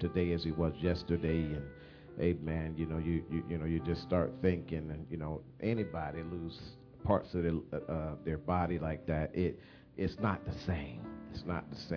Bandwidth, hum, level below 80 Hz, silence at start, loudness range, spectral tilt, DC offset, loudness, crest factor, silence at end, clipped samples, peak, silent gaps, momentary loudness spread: 5.4 kHz; none; -50 dBFS; 0 s; 2 LU; -7 dB/octave; under 0.1%; -36 LUFS; 22 dB; 0 s; under 0.1%; -14 dBFS; none; 11 LU